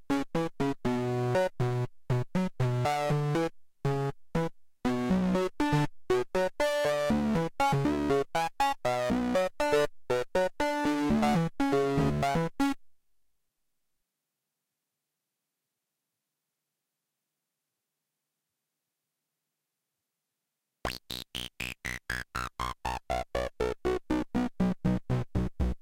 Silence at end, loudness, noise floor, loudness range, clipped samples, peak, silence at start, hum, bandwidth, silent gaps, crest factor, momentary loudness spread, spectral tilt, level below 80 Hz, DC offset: 0.05 s; -30 LUFS; -86 dBFS; 11 LU; under 0.1%; -16 dBFS; 0 s; none; 17 kHz; none; 14 dB; 8 LU; -6.5 dB/octave; -46 dBFS; under 0.1%